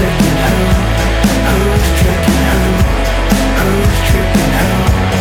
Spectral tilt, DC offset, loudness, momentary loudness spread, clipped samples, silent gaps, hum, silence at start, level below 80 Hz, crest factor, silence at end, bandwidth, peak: -5.5 dB/octave; under 0.1%; -12 LUFS; 1 LU; under 0.1%; none; none; 0 s; -16 dBFS; 10 dB; 0 s; 18 kHz; 0 dBFS